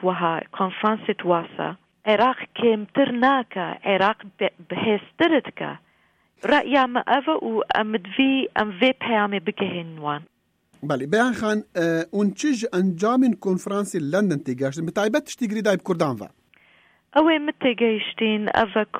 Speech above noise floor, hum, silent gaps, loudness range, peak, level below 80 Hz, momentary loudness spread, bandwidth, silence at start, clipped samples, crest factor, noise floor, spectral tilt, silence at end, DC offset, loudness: 41 dB; none; none; 3 LU; -6 dBFS; -64 dBFS; 9 LU; 15.5 kHz; 0 s; under 0.1%; 18 dB; -63 dBFS; -5.5 dB/octave; 0 s; under 0.1%; -22 LUFS